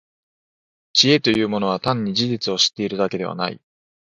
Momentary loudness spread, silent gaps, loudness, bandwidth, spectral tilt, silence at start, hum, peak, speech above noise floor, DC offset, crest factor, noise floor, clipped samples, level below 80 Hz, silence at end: 10 LU; none; -19 LUFS; 11 kHz; -4 dB/octave; 0.95 s; none; 0 dBFS; over 70 dB; under 0.1%; 22 dB; under -90 dBFS; under 0.1%; -58 dBFS; 0.55 s